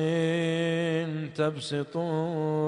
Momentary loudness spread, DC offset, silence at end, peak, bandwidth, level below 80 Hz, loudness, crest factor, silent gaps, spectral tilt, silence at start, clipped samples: 5 LU; under 0.1%; 0 s; -14 dBFS; 10.5 kHz; -70 dBFS; -29 LUFS; 14 dB; none; -6.5 dB/octave; 0 s; under 0.1%